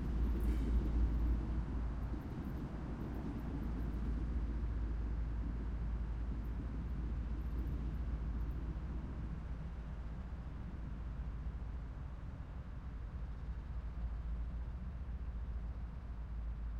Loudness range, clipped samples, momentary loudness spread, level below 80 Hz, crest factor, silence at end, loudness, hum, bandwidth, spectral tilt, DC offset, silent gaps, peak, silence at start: 6 LU; under 0.1%; 9 LU; -40 dBFS; 16 dB; 0 s; -43 LUFS; none; 5 kHz; -9 dB/octave; under 0.1%; none; -24 dBFS; 0 s